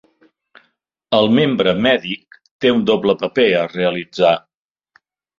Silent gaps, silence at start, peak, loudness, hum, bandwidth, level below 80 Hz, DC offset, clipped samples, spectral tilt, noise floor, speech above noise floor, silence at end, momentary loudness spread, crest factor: 2.51-2.59 s; 1.1 s; -2 dBFS; -16 LUFS; none; 7.4 kHz; -56 dBFS; under 0.1%; under 0.1%; -6.5 dB/octave; -66 dBFS; 51 dB; 1 s; 6 LU; 16 dB